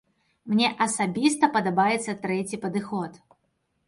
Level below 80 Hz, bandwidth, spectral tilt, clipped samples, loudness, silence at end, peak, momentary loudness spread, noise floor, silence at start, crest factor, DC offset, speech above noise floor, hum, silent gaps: -68 dBFS; 11.5 kHz; -4 dB/octave; under 0.1%; -25 LUFS; 0.7 s; -6 dBFS; 8 LU; -73 dBFS; 0.45 s; 20 dB; under 0.1%; 49 dB; none; none